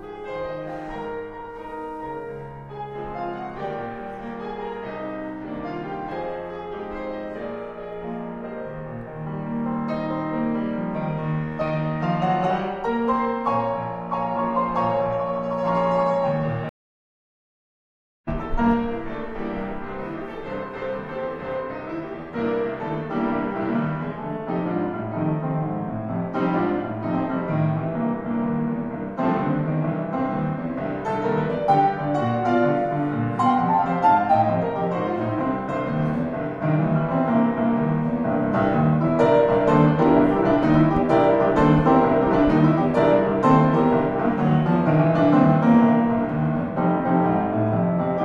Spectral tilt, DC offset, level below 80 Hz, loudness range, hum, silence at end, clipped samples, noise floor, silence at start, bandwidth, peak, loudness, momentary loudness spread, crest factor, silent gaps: -9.5 dB/octave; under 0.1%; -44 dBFS; 13 LU; none; 0 s; under 0.1%; under -90 dBFS; 0 s; 7.4 kHz; -4 dBFS; -23 LUFS; 15 LU; 18 dB; 16.69-18.24 s